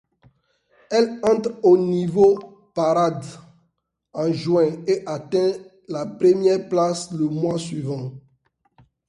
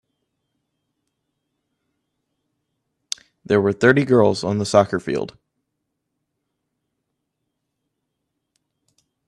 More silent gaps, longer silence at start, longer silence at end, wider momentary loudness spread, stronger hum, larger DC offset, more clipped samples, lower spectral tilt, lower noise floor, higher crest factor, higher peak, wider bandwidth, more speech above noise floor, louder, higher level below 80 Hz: neither; second, 0.9 s vs 3.5 s; second, 0.9 s vs 4 s; about the same, 14 LU vs 16 LU; neither; neither; neither; about the same, -6.5 dB/octave vs -5.5 dB/octave; second, -71 dBFS vs -77 dBFS; second, 18 dB vs 24 dB; second, -4 dBFS vs 0 dBFS; about the same, 11 kHz vs 11.5 kHz; second, 52 dB vs 60 dB; second, -21 LUFS vs -18 LUFS; about the same, -62 dBFS vs -60 dBFS